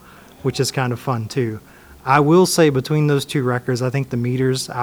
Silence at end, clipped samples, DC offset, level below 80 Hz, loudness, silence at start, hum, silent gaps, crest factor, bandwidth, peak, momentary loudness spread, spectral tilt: 0 s; under 0.1%; under 0.1%; -52 dBFS; -18 LUFS; 0.45 s; none; none; 18 dB; over 20 kHz; 0 dBFS; 11 LU; -5.5 dB/octave